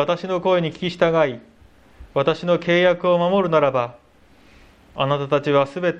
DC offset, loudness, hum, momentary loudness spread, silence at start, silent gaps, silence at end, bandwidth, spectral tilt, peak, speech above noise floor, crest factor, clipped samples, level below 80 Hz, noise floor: under 0.1%; -20 LUFS; none; 8 LU; 0 s; none; 0 s; 7.8 kHz; -7 dB/octave; -4 dBFS; 34 dB; 18 dB; under 0.1%; -54 dBFS; -53 dBFS